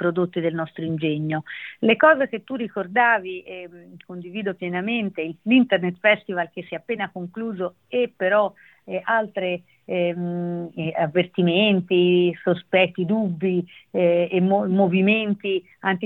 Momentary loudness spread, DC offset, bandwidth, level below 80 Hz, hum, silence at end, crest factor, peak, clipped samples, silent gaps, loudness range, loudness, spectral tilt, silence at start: 12 LU; under 0.1%; 4.1 kHz; -70 dBFS; none; 0 s; 18 dB; -4 dBFS; under 0.1%; none; 4 LU; -22 LUFS; -9.5 dB/octave; 0 s